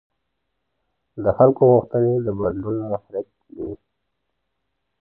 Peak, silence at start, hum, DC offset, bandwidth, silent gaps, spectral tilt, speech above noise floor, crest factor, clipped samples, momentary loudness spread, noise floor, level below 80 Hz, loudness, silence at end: -4 dBFS; 1.15 s; none; under 0.1%; 2 kHz; none; -14 dB/octave; 58 dB; 20 dB; under 0.1%; 19 LU; -77 dBFS; -50 dBFS; -19 LUFS; 1.25 s